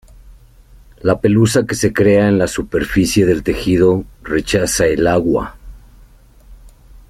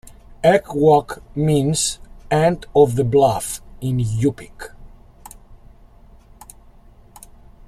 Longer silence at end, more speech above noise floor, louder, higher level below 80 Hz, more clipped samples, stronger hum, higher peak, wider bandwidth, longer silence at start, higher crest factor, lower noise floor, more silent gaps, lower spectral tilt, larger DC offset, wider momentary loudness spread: second, 0.1 s vs 2.1 s; about the same, 30 dB vs 29 dB; first, -15 LUFS vs -18 LUFS; first, -36 dBFS vs -42 dBFS; neither; neither; about the same, -2 dBFS vs -2 dBFS; about the same, 16 kHz vs 15.5 kHz; first, 0.25 s vs 0.05 s; about the same, 14 dB vs 18 dB; about the same, -44 dBFS vs -46 dBFS; neither; about the same, -5.5 dB/octave vs -5.5 dB/octave; neither; second, 8 LU vs 17 LU